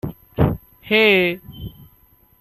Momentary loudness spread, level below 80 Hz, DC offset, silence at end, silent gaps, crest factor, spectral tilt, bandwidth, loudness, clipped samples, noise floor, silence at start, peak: 23 LU; -40 dBFS; under 0.1%; 0.7 s; none; 18 dB; -7.5 dB/octave; 13.5 kHz; -17 LUFS; under 0.1%; -55 dBFS; 0.05 s; -2 dBFS